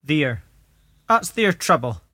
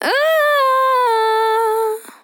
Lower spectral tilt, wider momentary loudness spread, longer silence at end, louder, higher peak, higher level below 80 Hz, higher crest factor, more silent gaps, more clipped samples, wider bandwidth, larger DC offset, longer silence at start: first, -4.5 dB/octave vs 0 dB/octave; about the same, 6 LU vs 4 LU; about the same, 0.15 s vs 0.15 s; second, -20 LUFS vs -15 LUFS; about the same, -4 dBFS vs -6 dBFS; first, -52 dBFS vs -86 dBFS; first, 18 dB vs 10 dB; neither; neither; second, 16.5 kHz vs 19.5 kHz; neither; about the same, 0.1 s vs 0 s